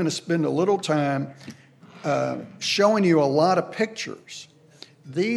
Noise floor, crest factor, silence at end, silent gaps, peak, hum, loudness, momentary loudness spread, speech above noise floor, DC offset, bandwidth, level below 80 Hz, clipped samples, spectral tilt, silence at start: -50 dBFS; 18 dB; 0 s; none; -6 dBFS; none; -23 LUFS; 19 LU; 27 dB; under 0.1%; 13 kHz; -78 dBFS; under 0.1%; -5 dB/octave; 0 s